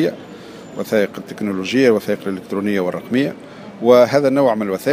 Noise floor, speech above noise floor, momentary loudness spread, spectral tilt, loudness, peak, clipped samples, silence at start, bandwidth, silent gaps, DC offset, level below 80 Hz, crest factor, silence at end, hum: -36 dBFS; 19 dB; 21 LU; -6 dB/octave; -17 LUFS; 0 dBFS; under 0.1%; 0 s; 15.5 kHz; none; under 0.1%; -64 dBFS; 16 dB; 0 s; none